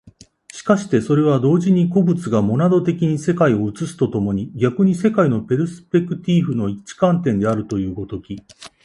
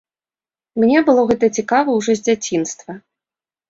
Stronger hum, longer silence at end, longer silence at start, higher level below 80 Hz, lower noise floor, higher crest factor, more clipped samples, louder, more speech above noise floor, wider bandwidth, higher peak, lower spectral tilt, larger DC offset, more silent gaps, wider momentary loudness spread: neither; second, 0.15 s vs 0.7 s; second, 0.55 s vs 0.75 s; first, -50 dBFS vs -56 dBFS; second, -45 dBFS vs under -90 dBFS; about the same, 18 dB vs 16 dB; neither; about the same, -18 LUFS vs -16 LUFS; second, 28 dB vs over 74 dB; first, 11.5 kHz vs 7.8 kHz; about the same, 0 dBFS vs -2 dBFS; first, -8 dB/octave vs -4.5 dB/octave; neither; neither; second, 10 LU vs 17 LU